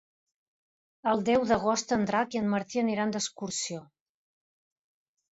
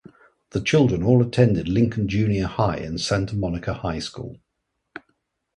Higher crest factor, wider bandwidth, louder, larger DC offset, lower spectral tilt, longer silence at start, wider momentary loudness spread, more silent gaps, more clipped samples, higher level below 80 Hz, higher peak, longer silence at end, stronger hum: about the same, 18 dB vs 20 dB; second, 8 kHz vs 11 kHz; second, -29 LUFS vs -22 LUFS; neither; second, -4 dB/octave vs -6.5 dB/octave; first, 1.05 s vs 0.55 s; second, 8 LU vs 19 LU; neither; neither; second, -64 dBFS vs -42 dBFS; second, -12 dBFS vs -2 dBFS; first, 1.45 s vs 0.6 s; neither